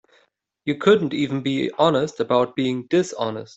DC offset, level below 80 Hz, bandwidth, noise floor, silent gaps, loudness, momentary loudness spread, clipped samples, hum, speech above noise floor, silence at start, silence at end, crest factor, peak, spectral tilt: under 0.1%; -62 dBFS; 8.2 kHz; -64 dBFS; none; -21 LUFS; 8 LU; under 0.1%; none; 43 dB; 0.65 s; 0.1 s; 18 dB; -4 dBFS; -6 dB/octave